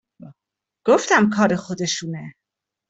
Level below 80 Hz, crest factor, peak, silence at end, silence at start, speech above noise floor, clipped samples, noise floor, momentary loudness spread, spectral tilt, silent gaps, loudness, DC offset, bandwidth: -64 dBFS; 18 dB; -4 dBFS; 0.6 s; 0.25 s; 65 dB; under 0.1%; -85 dBFS; 17 LU; -4.5 dB/octave; none; -19 LUFS; under 0.1%; 8.2 kHz